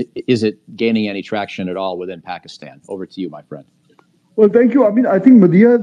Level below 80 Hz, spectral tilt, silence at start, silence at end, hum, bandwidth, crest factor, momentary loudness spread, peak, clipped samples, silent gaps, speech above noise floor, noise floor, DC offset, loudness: -66 dBFS; -8 dB/octave; 0 s; 0 s; none; 9.2 kHz; 14 dB; 21 LU; 0 dBFS; under 0.1%; none; 40 dB; -54 dBFS; under 0.1%; -14 LUFS